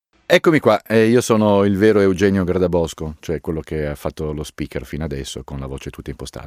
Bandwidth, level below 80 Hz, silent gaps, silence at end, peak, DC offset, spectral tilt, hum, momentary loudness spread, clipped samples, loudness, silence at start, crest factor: 16 kHz; -38 dBFS; none; 0 s; 0 dBFS; under 0.1%; -6 dB/octave; none; 15 LU; under 0.1%; -18 LUFS; 0.3 s; 18 dB